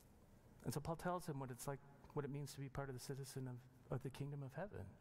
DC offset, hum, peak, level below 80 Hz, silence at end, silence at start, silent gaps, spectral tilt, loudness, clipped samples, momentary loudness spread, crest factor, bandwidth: under 0.1%; none; -32 dBFS; -68 dBFS; 0 s; 0 s; none; -6 dB/octave; -50 LUFS; under 0.1%; 8 LU; 18 dB; 16 kHz